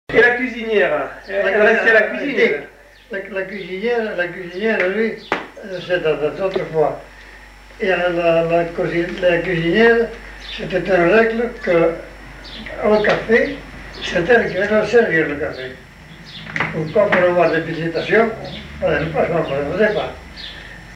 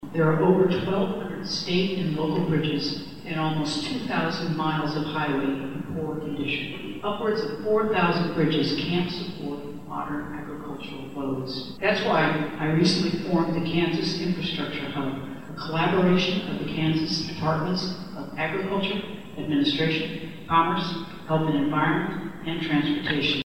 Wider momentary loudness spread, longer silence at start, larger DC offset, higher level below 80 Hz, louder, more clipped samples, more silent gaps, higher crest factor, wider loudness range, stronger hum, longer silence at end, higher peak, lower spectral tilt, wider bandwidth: first, 17 LU vs 11 LU; about the same, 0.1 s vs 0 s; second, under 0.1% vs 0.6%; first, -42 dBFS vs -52 dBFS; first, -17 LUFS vs -26 LUFS; neither; neither; about the same, 16 dB vs 20 dB; about the same, 4 LU vs 3 LU; neither; about the same, 0 s vs 0 s; first, -2 dBFS vs -6 dBFS; about the same, -6 dB/octave vs -6 dB/octave; second, 10.5 kHz vs 16 kHz